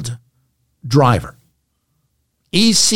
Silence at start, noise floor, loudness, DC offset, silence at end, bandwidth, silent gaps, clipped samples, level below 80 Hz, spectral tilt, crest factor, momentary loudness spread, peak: 0 s; -67 dBFS; -14 LUFS; under 0.1%; 0 s; 16.5 kHz; none; under 0.1%; -46 dBFS; -4 dB/octave; 16 dB; 23 LU; -2 dBFS